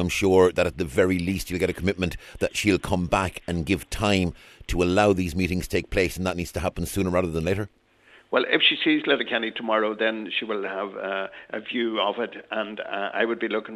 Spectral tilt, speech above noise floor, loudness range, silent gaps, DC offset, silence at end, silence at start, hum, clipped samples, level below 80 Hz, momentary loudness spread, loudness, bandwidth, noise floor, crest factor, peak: -5 dB/octave; 31 dB; 4 LU; none; under 0.1%; 0 s; 0 s; none; under 0.1%; -42 dBFS; 11 LU; -24 LUFS; 14 kHz; -56 dBFS; 20 dB; -6 dBFS